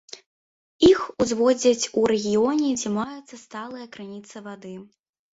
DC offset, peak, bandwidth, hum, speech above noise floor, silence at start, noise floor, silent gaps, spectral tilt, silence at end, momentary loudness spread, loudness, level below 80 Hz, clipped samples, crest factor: under 0.1%; -6 dBFS; 8 kHz; none; over 66 dB; 0.15 s; under -90 dBFS; 0.26-0.79 s; -4 dB/octave; 0.55 s; 22 LU; -21 LUFS; -54 dBFS; under 0.1%; 18 dB